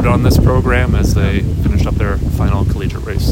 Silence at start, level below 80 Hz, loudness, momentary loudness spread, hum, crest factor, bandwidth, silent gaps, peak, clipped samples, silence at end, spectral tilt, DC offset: 0 s; -18 dBFS; -14 LUFS; 6 LU; none; 12 dB; 16.5 kHz; none; 0 dBFS; under 0.1%; 0 s; -7 dB/octave; under 0.1%